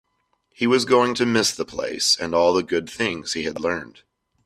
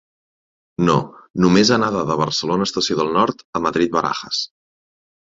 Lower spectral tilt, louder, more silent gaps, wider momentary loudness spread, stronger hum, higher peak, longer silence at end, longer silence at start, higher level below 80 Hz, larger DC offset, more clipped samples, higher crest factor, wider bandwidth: second, -3 dB/octave vs -5 dB/octave; second, -21 LUFS vs -18 LUFS; second, none vs 1.30-1.34 s, 3.44-3.53 s; about the same, 9 LU vs 10 LU; neither; about the same, -4 dBFS vs -2 dBFS; second, 0.55 s vs 0.75 s; second, 0.6 s vs 0.8 s; second, -60 dBFS vs -52 dBFS; neither; neither; about the same, 18 dB vs 18 dB; first, 14.5 kHz vs 7.8 kHz